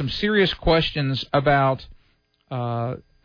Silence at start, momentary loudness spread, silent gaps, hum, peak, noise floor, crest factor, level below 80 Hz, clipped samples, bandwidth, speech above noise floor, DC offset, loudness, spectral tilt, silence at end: 0 s; 11 LU; none; none; -8 dBFS; -63 dBFS; 16 dB; -40 dBFS; under 0.1%; 5.4 kHz; 42 dB; under 0.1%; -22 LUFS; -7.5 dB/octave; 0.3 s